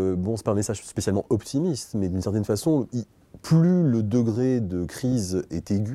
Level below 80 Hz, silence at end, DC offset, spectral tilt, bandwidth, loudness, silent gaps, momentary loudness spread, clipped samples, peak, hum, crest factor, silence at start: -54 dBFS; 0 s; under 0.1%; -7 dB/octave; 13.5 kHz; -25 LUFS; none; 9 LU; under 0.1%; -8 dBFS; none; 16 dB; 0 s